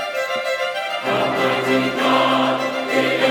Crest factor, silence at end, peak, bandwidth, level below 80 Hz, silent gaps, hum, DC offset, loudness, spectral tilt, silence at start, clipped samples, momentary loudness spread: 14 dB; 0 s; -4 dBFS; 19 kHz; -62 dBFS; none; none; under 0.1%; -19 LUFS; -4 dB/octave; 0 s; under 0.1%; 6 LU